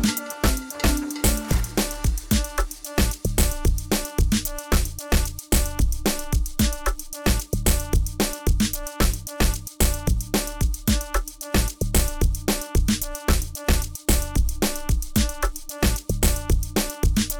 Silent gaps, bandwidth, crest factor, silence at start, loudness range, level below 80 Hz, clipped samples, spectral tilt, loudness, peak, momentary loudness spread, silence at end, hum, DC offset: none; over 20 kHz; 12 dB; 0 s; 1 LU; -24 dBFS; under 0.1%; -4 dB/octave; -24 LUFS; -10 dBFS; 3 LU; 0 s; none; 0.2%